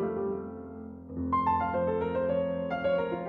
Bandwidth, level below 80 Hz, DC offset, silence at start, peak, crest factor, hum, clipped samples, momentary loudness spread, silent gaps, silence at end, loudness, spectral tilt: 4.6 kHz; -54 dBFS; under 0.1%; 0 s; -16 dBFS; 14 dB; none; under 0.1%; 14 LU; none; 0 s; -30 LUFS; -9.5 dB/octave